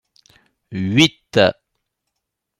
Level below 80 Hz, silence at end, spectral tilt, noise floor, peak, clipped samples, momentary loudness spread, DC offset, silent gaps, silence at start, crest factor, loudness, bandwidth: -56 dBFS; 1.1 s; -5 dB/octave; -79 dBFS; 0 dBFS; under 0.1%; 11 LU; under 0.1%; none; 0.7 s; 20 dB; -17 LUFS; 16 kHz